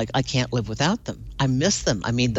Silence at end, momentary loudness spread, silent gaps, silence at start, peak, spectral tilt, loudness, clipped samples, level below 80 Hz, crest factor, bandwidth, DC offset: 0 s; 6 LU; none; 0 s; -8 dBFS; -4.5 dB/octave; -23 LUFS; under 0.1%; -42 dBFS; 14 dB; 8.2 kHz; under 0.1%